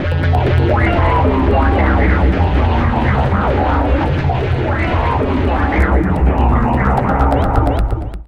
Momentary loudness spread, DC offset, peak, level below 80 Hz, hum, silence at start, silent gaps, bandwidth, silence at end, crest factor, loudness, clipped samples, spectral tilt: 3 LU; under 0.1%; -2 dBFS; -18 dBFS; none; 0 s; none; 5.6 kHz; 0.05 s; 12 dB; -15 LUFS; under 0.1%; -9 dB/octave